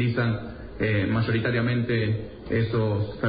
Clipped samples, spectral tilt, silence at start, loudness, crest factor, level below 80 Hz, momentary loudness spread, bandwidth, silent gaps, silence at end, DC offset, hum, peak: under 0.1%; -12 dB/octave; 0 s; -26 LUFS; 12 dB; -46 dBFS; 6 LU; 5 kHz; none; 0 s; under 0.1%; none; -12 dBFS